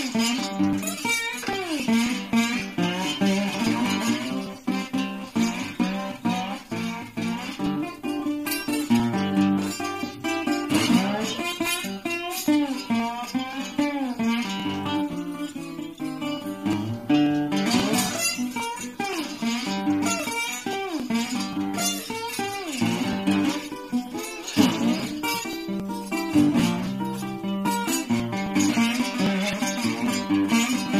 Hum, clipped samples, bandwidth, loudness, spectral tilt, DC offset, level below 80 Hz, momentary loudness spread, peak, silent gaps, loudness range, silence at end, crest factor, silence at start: none; under 0.1%; 15.5 kHz; -25 LUFS; -4 dB/octave; under 0.1%; -58 dBFS; 8 LU; -6 dBFS; none; 4 LU; 0 s; 18 dB; 0 s